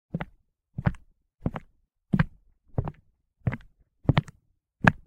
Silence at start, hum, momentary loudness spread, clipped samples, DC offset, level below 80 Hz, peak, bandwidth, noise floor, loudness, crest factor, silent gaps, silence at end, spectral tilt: 0.15 s; none; 16 LU; under 0.1%; under 0.1%; -42 dBFS; 0 dBFS; 10 kHz; -67 dBFS; -30 LUFS; 30 dB; none; 0.1 s; -7.5 dB/octave